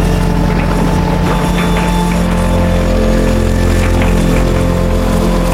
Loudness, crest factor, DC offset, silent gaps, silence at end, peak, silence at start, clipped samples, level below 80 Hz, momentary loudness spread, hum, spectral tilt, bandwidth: -13 LUFS; 10 dB; under 0.1%; none; 0 s; -2 dBFS; 0 s; under 0.1%; -16 dBFS; 1 LU; none; -6.5 dB/octave; 15.5 kHz